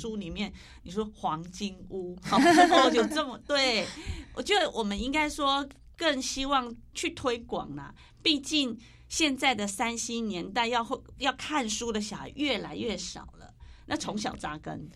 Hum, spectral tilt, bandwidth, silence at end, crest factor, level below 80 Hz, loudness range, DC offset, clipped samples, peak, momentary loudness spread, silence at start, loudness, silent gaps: none; -3 dB/octave; 14.5 kHz; 0.05 s; 24 dB; -50 dBFS; 7 LU; under 0.1%; under 0.1%; -6 dBFS; 14 LU; 0 s; -28 LUFS; none